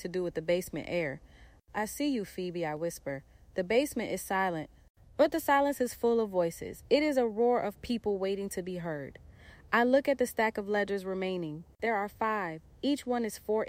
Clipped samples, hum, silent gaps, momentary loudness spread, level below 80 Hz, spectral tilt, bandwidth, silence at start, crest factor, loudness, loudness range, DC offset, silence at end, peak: under 0.1%; none; 4.90-4.95 s; 12 LU; -60 dBFS; -5 dB/octave; 16.5 kHz; 0 s; 20 dB; -31 LUFS; 5 LU; under 0.1%; 0 s; -12 dBFS